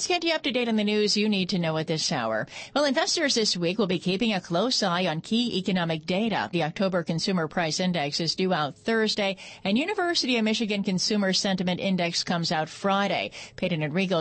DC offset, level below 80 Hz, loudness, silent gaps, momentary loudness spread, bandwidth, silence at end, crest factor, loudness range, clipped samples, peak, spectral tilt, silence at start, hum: under 0.1%; -64 dBFS; -25 LUFS; none; 4 LU; 8.8 kHz; 0 s; 14 dB; 2 LU; under 0.1%; -12 dBFS; -4 dB/octave; 0 s; none